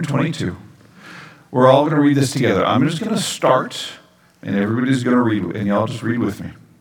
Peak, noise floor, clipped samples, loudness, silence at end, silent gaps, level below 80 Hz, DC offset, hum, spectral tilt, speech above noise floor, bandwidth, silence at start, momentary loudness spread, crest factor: 0 dBFS; -41 dBFS; under 0.1%; -18 LUFS; 0.3 s; none; -58 dBFS; under 0.1%; none; -6 dB/octave; 24 dB; 18.5 kHz; 0 s; 18 LU; 18 dB